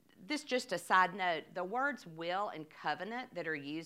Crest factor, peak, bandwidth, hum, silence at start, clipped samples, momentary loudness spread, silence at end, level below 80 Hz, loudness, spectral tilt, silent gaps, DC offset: 22 dB; -16 dBFS; 16 kHz; none; 0.2 s; under 0.1%; 11 LU; 0 s; -86 dBFS; -36 LUFS; -3.5 dB/octave; none; under 0.1%